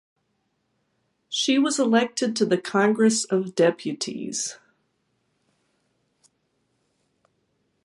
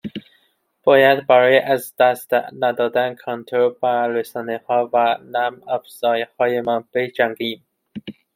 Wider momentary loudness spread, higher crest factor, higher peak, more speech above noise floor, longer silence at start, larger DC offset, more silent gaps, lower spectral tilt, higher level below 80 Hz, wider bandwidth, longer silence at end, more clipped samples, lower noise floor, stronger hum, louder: second, 10 LU vs 15 LU; about the same, 18 dB vs 18 dB; second, -8 dBFS vs -2 dBFS; first, 51 dB vs 45 dB; first, 1.3 s vs 0.05 s; neither; neither; second, -3.5 dB/octave vs -5 dB/octave; second, -78 dBFS vs -68 dBFS; second, 11.5 kHz vs 16.5 kHz; first, 3.3 s vs 0.25 s; neither; first, -73 dBFS vs -63 dBFS; neither; second, -23 LUFS vs -19 LUFS